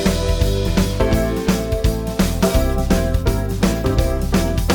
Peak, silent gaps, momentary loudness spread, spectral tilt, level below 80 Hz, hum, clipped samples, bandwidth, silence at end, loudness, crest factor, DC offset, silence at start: -2 dBFS; none; 2 LU; -6 dB/octave; -22 dBFS; none; under 0.1%; 19.5 kHz; 0 s; -19 LUFS; 16 dB; under 0.1%; 0 s